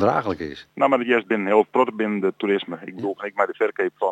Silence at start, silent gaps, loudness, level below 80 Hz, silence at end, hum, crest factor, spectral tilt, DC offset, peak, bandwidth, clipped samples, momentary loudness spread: 0 s; none; -22 LUFS; -62 dBFS; 0 s; none; 18 dB; -7 dB/octave; under 0.1%; -4 dBFS; 8 kHz; under 0.1%; 11 LU